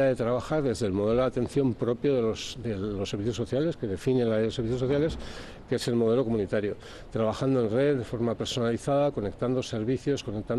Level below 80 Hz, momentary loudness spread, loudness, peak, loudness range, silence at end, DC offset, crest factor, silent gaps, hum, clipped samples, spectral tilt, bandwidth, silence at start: -50 dBFS; 7 LU; -28 LUFS; -14 dBFS; 1 LU; 0 s; under 0.1%; 12 dB; none; none; under 0.1%; -6.5 dB/octave; 12.5 kHz; 0 s